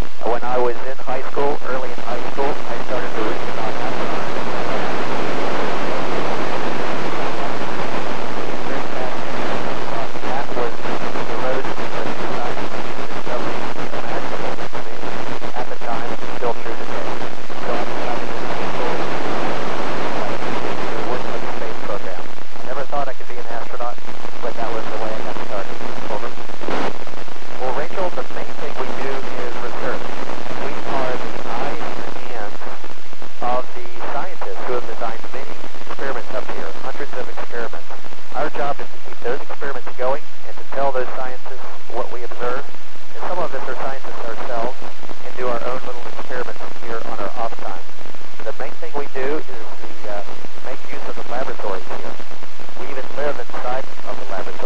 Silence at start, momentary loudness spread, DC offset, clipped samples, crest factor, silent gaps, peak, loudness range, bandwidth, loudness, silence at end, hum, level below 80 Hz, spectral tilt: 0 s; 10 LU; 40%; under 0.1%; 16 dB; none; -2 dBFS; 5 LU; 13 kHz; -26 LUFS; 0 s; none; -62 dBFS; -5.5 dB/octave